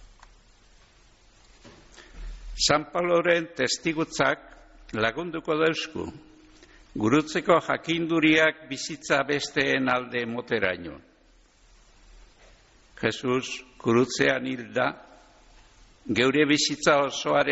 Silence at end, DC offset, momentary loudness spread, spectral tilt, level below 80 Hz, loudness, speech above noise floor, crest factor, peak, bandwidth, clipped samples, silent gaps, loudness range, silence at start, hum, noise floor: 0 s; under 0.1%; 14 LU; -3 dB/octave; -52 dBFS; -25 LUFS; 34 dB; 18 dB; -8 dBFS; 8 kHz; under 0.1%; none; 7 LU; 0.05 s; none; -59 dBFS